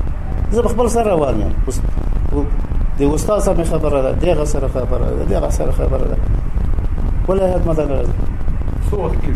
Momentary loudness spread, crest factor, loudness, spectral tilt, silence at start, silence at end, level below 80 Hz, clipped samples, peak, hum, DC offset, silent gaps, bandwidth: 6 LU; 12 dB; -18 LUFS; -7 dB/octave; 0 s; 0 s; -18 dBFS; under 0.1%; -2 dBFS; none; under 0.1%; none; 13 kHz